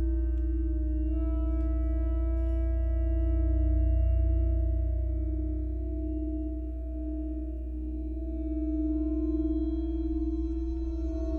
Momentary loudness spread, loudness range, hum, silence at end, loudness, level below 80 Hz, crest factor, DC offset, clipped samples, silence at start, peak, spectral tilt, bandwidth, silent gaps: 8 LU; 5 LU; 60 Hz at -30 dBFS; 0 s; -31 LUFS; -30 dBFS; 10 dB; under 0.1%; under 0.1%; 0 s; -18 dBFS; -12 dB/octave; 2.4 kHz; none